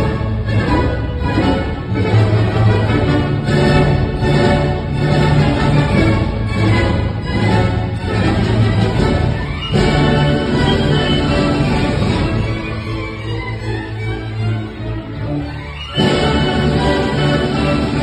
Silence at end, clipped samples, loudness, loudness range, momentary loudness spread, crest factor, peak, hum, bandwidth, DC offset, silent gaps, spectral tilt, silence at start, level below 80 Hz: 0 s; under 0.1%; -16 LUFS; 6 LU; 9 LU; 14 dB; -2 dBFS; none; 9.6 kHz; under 0.1%; none; -7 dB/octave; 0 s; -26 dBFS